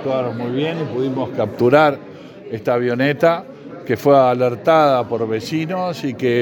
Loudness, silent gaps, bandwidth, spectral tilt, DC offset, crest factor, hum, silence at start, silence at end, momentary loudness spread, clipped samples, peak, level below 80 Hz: -17 LUFS; none; 18 kHz; -7 dB/octave; under 0.1%; 16 dB; none; 0 s; 0 s; 12 LU; under 0.1%; 0 dBFS; -64 dBFS